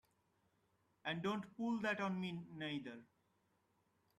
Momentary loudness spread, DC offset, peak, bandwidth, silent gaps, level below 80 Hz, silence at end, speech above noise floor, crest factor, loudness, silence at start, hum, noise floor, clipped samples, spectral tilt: 9 LU; under 0.1%; -28 dBFS; 12 kHz; none; -82 dBFS; 1.15 s; 38 dB; 18 dB; -43 LUFS; 1.05 s; none; -80 dBFS; under 0.1%; -6 dB/octave